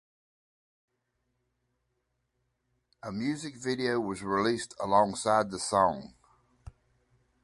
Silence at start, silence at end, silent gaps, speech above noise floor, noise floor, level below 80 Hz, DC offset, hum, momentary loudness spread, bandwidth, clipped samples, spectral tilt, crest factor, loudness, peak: 3.05 s; 0.75 s; none; 50 dB; -79 dBFS; -62 dBFS; under 0.1%; none; 9 LU; 11.5 kHz; under 0.1%; -4.5 dB/octave; 22 dB; -29 LUFS; -10 dBFS